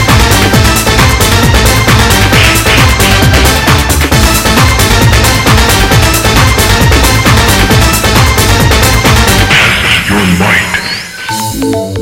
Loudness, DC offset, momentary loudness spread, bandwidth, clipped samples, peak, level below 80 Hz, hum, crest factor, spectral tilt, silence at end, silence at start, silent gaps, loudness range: -6 LUFS; under 0.1%; 3 LU; 19.5 kHz; 2%; 0 dBFS; -14 dBFS; none; 6 dB; -4 dB/octave; 0 s; 0 s; none; 1 LU